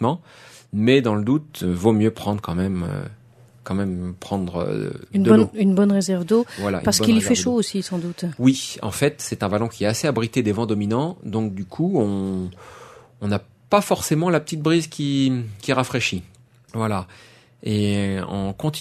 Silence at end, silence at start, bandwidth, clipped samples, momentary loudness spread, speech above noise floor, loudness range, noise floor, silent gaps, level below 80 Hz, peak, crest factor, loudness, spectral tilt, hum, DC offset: 0 s; 0 s; 13.5 kHz; under 0.1%; 11 LU; 26 dB; 6 LU; -46 dBFS; none; -52 dBFS; -2 dBFS; 20 dB; -21 LUFS; -5.5 dB/octave; none; under 0.1%